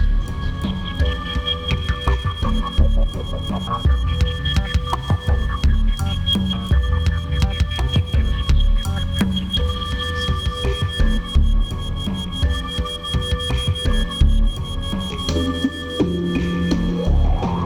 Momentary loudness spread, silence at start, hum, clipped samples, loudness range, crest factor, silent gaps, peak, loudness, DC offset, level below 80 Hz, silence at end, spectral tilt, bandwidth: 5 LU; 0 s; none; under 0.1%; 2 LU; 16 dB; none; -4 dBFS; -21 LUFS; under 0.1%; -20 dBFS; 0 s; -6 dB/octave; 13.5 kHz